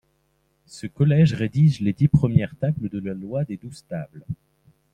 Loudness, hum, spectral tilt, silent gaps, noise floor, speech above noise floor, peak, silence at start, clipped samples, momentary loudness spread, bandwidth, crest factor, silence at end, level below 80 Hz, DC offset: -21 LUFS; none; -8.5 dB/octave; none; -67 dBFS; 46 dB; -4 dBFS; 0.75 s; under 0.1%; 18 LU; 9.4 kHz; 20 dB; 0.6 s; -50 dBFS; under 0.1%